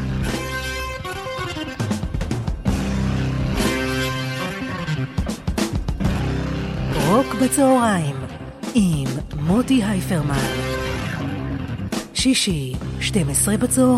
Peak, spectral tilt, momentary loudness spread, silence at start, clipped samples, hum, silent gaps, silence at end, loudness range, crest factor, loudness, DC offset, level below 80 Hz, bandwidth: -4 dBFS; -5 dB/octave; 9 LU; 0 s; under 0.1%; none; none; 0 s; 4 LU; 16 dB; -22 LUFS; under 0.1%; -32 dBFS; 16 kHz